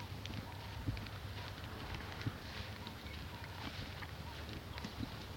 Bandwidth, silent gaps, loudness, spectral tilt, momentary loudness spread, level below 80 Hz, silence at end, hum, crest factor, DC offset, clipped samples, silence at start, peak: 17.5 kHz; none; -46 LUFS; -5 dB/octave; 4 LU; -54 dBFS; 0 s; none; 20 dB; under 0.1%; under 0.1%; 0 s; -26 dBFS